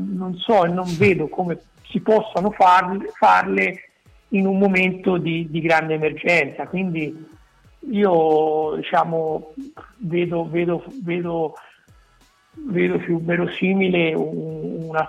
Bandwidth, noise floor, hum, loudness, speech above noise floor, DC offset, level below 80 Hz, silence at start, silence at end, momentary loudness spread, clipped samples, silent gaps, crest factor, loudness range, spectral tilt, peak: 10 kHz; -56 dBFS; none; -20 LUFS; 37 dB; under 0.1%; -56 dBFS; 0 s; 0 s; 12 LU; under 0.1%; none; 14 dB; 6 LU; -7 dB/octave; -6 dBFS